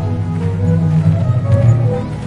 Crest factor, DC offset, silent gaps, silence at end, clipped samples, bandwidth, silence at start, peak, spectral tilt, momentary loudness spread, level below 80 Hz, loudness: 12 dB; under 0.1%; none; 0 s; under 0.1%; 7.4 kHz; 0 s; -2 dBFS; -9.5 dB/octave; 6 LU; -36 dBFS; -14 LUFS